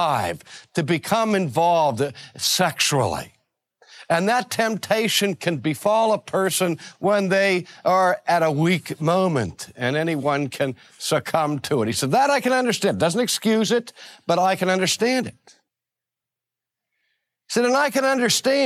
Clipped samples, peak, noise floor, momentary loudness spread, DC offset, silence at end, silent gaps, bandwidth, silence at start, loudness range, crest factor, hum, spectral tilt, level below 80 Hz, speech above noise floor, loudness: under 0.1%; -6 dBFS; -87 dBFS; 8 LU; under 0.1%; 0 s; none; 16 kHz; 0 s; 4 LU; 16 dB; none; -4 dB/octave; -62 dBFS; 66 dB; -21 LUFS